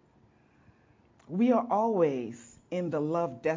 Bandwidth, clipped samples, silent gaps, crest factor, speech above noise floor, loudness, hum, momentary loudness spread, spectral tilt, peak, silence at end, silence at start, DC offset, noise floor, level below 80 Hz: 7.6 kHz; under 0.1%; none; 18 dB; 35 dB; -29 LUFS; none; 12 LU; -8 dB/octave; -14 dBFS; 0 s; 1.3 s; under 0.1%; -63 dBFS; -72 dBFS